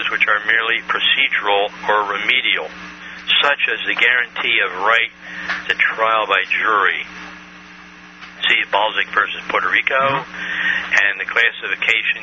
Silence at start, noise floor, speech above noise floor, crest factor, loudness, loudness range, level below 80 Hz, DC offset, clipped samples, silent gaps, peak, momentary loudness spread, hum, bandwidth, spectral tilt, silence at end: 0 s; -40 dBFS; 22 dB; 18 dB; -16 LUFS; 3 LU; -58 dBFS; under 0.1%; under 0.1%; none; 0 dBFS; 10 LU; none; 7.2 kHz; 2 dB/octave; 0 s